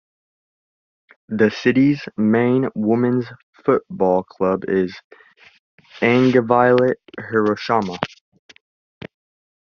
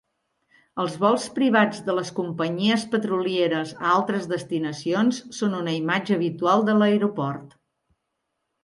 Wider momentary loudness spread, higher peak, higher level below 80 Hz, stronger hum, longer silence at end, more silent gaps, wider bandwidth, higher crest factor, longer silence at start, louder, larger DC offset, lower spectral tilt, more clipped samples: about the same, 11 LU vs 9 LU; about the same, -2 dBFS vs -4 dBFS; first, -62 dBFS vs -70 dBFS; neither; first, 1.65 s vs 1.15 s; first, 3.43-3.53 s, 5.04-5.10 s, 5.59-5.78 s vs none; second, 6.8 kHz vs 11.5 kHz; about the same, 18 dB vs 18 dB; first, 1.3 s vs 0.75 s; first, -18 LUFS vs -23 LUFS; neither; about the same, -5.5 dB/octave vs -5.5 dB/octave; neither